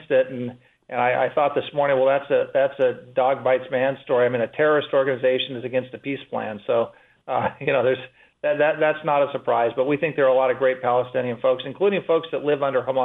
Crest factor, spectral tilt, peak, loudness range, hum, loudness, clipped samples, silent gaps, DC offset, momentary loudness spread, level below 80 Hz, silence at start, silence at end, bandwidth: 14 dB; -8 dB/octave; -8 dBFS; 3 LU; none; -22 LUFS; under 0.1%; none; under 0.1%; 8 LU; -68 dBFS; 0 s; 0 s; 4 kHz